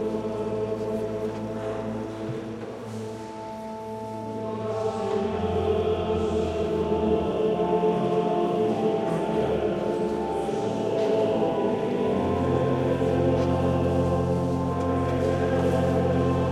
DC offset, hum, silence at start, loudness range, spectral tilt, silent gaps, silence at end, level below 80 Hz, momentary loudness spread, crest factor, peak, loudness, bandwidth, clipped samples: under 0.1%; none; 0 s; 8 LU; -7.5 dB/octave; none; 0 s; -46 dBFS; 10 LU; 14 dB; -10 dBFS; -26 LUFS; 12 kHz; under 0.1%